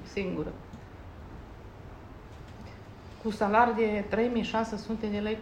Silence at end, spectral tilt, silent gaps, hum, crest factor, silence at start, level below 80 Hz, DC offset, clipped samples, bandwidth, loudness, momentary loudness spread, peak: 0 s; -6.5 dB/octave; none; none; 20 dB; 0 s; -52 dBFS; under 0.1%; under 0.1%; 10.5 kHz; -29 LUFS; 23 LU; -10 dBFS